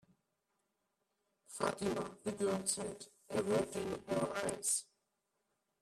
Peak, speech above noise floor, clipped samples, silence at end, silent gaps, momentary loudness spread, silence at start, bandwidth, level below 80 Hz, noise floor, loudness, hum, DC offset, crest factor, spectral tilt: -20 dBFS; 47 dB; under 0.1%; 1 s; none; 7 LU; 1.5 s; 15 kHz; -72 dBFS; -85 dBFS; -38 LUFS; none; under 0.1%; 20 dB; -3.5 dB/octave